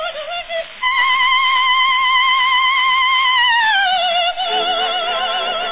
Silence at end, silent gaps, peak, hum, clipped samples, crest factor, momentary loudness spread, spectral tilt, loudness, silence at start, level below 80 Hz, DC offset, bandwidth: 0 s; none; -4 dBFS; none; under 0.1%; 12 dB; 7 LU; -2.5 dB/octave; -14 LUFS; 0 s; -52 dBFS; under 0.1%; 4 kHz